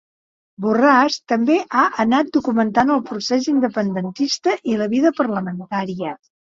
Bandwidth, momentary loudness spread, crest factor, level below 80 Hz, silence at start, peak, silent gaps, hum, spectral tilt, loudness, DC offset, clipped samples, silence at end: 7.6 kHz; 9 LU; 18 dB; -60 dBFS; 0.6 s; -2 dBFS; none; none; -5 dB/octave; -18 LUFS; under 0.1%; under 0.1%; 0.3 s